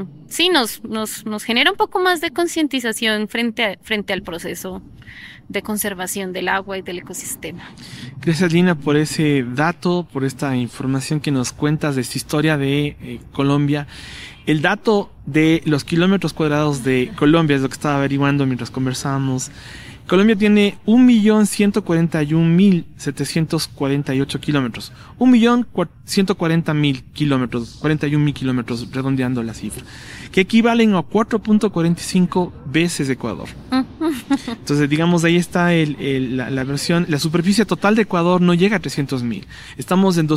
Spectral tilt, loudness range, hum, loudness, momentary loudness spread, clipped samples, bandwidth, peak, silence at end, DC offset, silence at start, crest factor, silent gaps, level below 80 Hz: -5.5 dB/octave; 5 LU; none; -18 LUFS; 13 LU; under 0.1%; 16 kHz; -2 dBFS; 0 s; under 0.1%; 0 s; 16 dB; none; -48 dBFS